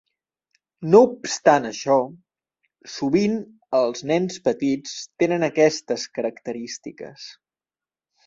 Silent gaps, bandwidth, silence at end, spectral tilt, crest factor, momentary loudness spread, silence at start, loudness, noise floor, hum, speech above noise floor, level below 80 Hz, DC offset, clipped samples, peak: none; 7.8 kHz; 0.95 s; -5 dB/octave; 22 dB; 17 LU; 0.8 s; -21 LUFS; under -90 dBFS; none; over 69 dB; -66 dBFS; under 0.1%; under 0.1%; -2 dBFS